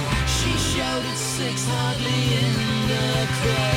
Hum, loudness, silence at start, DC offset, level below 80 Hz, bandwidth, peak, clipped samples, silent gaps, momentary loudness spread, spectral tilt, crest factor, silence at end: none; -22 LUFS; 0 s; under 0.1%; -34 dBFS; 16.5 kHz; -8 dBFS; under 0.1%; none; 3 LU; -4 dB/octave; 14 dB; 0 s